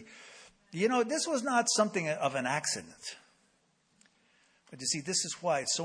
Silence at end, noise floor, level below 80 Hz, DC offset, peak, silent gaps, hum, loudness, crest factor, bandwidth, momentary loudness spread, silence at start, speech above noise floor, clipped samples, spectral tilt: 0 s; -72 dBFS; -78 dBFS; under 0.1%; -12 dBFS; none; none; -31 LUFS; 20 dB; 10.5 kHz; 17 LU; 0 s; 40 dB; under 0.1%; -2.5 dB/octave